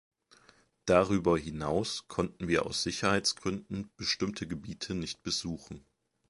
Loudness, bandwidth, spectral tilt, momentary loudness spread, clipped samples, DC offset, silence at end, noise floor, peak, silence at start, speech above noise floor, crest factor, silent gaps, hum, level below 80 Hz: -32 LUFS; 11.5 kHz; -4 dB/octave; 13 LU; under 0.1%; under 0.1%; 0.5 s; -64 dBFS; -8 dBFS; 0.85 s; 32 dB; 24 dB; none; none; -54 dBFS